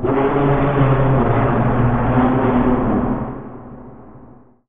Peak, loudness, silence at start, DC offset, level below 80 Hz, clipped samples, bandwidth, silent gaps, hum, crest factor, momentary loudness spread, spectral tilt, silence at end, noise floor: -2 dBFS; -16 LUFS; 0 s; 2%; -28 dBFS; under 0.1%; 3.7 kHz; none; none; 14 dB; 15 LU; -11.5 dB/octave; 0 s; -44 dBFS